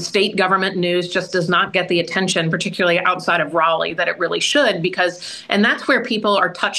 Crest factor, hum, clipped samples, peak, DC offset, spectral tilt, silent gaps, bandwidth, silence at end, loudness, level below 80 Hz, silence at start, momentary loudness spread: 18 dB; none; under 0.1%; -2 dBFS; under 0.1%; -4 dB/octave; none; 12.5 kHz; 0 s; -17 LUFS; -64 dBFS; 0 s; 4 LU